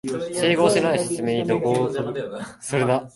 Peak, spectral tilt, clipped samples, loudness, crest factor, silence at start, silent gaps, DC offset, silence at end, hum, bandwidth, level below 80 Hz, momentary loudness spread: -4 dBFS; -5 dB/octave; under 0.1%; -22 LUFS; 18 dB; 0.05 s; none; under 0.1%; 0.05 s; none; 12 kHz; -60 dBFS; 11 LU